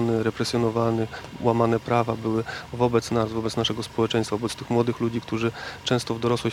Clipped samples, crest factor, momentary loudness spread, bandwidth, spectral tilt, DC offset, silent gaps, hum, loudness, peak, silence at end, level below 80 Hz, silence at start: under 0.1%; 18 dB; 6 LU; 15.5 kHz; -6 dB/octave; under 0.1%; none; none; -25 LUFS; -6 dBFS; 0 s; -54 dBFS; 0 s